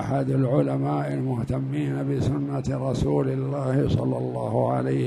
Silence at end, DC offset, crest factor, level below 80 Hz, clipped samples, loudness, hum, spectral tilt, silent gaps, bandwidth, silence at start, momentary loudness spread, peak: 0 s; under 0.1%; 16 dB; -46 dBFS; under 0.1%; -25 LUFS; none; -8.5 dB/octave; none; 11 kHz; 0 s; 4 LU; -8 dBFS